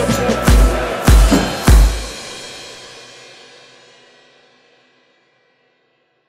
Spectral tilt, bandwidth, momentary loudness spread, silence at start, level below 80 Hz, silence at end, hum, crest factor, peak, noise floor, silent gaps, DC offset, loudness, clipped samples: -5 dB/octave; 16 kHz; 23 LU; 0 s; -18 dBFS; 3.4 s; none; 16 dB; 0 dBFS; -62 dBFS; none; under 0.1%; -14 LUFS; under 0.1%